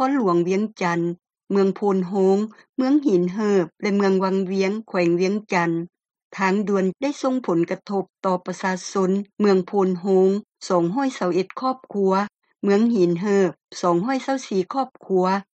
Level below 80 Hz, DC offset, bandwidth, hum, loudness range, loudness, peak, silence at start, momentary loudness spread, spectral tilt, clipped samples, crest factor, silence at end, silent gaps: -70 dBFS; under 0.1%; 8.6 kHz; none; 2 LU; -22 LUFS; -6 dBFS; 0 s; 7 LU; -6.5 dB/octave; under 0.1%; 14 dB; 0.15 s; 2.69-2.73 s, 6.25-6.30 s